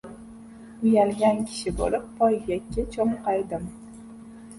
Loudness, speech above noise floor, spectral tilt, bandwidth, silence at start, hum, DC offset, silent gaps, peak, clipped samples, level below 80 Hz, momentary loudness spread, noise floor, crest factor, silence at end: -25 LUFS; 20 dB; -6 dB/octave; 11.5 kHz; 0.05 s; none; under 0.1%; none; -8 dBFS; under 0.1%; -44 dBFS; 23 LU; -44 dBFS; 18 dB; 0 s